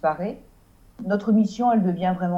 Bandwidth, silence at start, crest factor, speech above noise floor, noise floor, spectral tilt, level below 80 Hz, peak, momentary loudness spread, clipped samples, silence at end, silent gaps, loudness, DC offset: 7.6 kHz; 0.05 s; 12 dB; 31 dB; -53 dBFS; -8.5 dB/octave; -56 dBFS; -10 dBFS; 14 LU; under 0.1%; 0 s; none; -22 LUFS; under 0.1%